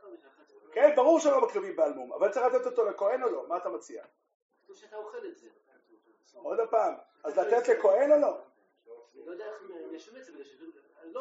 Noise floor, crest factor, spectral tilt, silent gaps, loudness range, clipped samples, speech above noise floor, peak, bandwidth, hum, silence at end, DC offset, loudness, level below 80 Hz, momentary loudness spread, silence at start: -65 dBFS; 22 dB; -2 dB/octave; 4.34-4.49 s; 10 LU; under 0.1%; 37 dB; -8 dBFS; 8 kHz; none; 0 s; under 0.1%; -27 LUFS; under -90 dBFS; 23 LU; 0.05 s